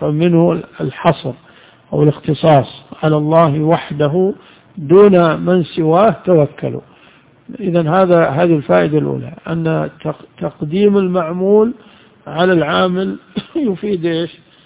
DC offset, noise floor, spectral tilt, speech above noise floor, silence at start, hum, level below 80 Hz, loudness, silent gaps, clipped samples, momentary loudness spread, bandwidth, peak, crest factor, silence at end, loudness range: under 0.1%; -47 dBFS; -11.5 dB/octave; 33 dB; 0 s; none; -50 dBFS; -14 LUFS; none; 0.3%; 13 LU; 4 kHz; 0 dBFS; 14 dB; 0.35 s; 3 LU